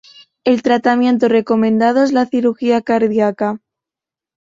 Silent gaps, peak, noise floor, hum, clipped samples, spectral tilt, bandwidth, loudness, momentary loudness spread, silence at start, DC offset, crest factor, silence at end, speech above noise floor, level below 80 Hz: none; -2 dBFS; -87 dBFS; none; under 0.1%; -6.5 dB/octave; 7.6 kHz; -15 LUFS; 7 LU; 0.45 s; under 0.1%; 14 dB; 1 s; 74 dB; -60 dBFS